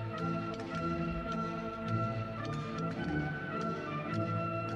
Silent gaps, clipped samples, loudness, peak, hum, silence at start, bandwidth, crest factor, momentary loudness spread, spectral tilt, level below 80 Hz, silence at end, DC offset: none; under 0.1%; -36 LUFS; -22 dBFS; 50 Hz at -55 dBFS; 0 s; 8.8 kHz; 14 dB; 3 LU; -7.5 dB/octave; -54 dBFS; 0 s; under 0.1%